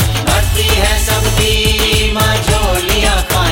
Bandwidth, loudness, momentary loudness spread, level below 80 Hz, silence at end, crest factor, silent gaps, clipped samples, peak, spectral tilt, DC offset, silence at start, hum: 16.5 kHz; -12 LUFS; 2 LU; -18 dBFS; 0 s; 12 dB; none; under 0.1%; 0 dBFS; -3.5 dB/octave; under 0.1%; 0 s; none